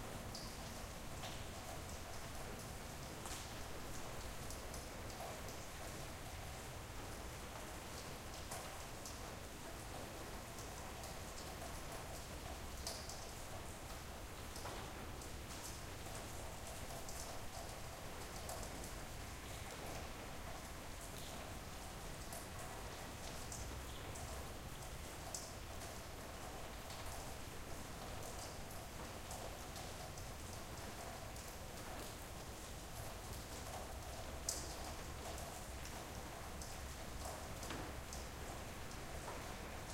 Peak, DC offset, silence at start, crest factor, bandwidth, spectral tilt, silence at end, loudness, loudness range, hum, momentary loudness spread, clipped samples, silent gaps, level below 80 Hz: -22 dBFS; under 0.1%; 0 s; 26 dB; 16.5 kHz; -3.5 dB/octave; 0 s; -49 LUFS; 2 LU; none; 3 LU; under 0.1%; none; -56 dBFS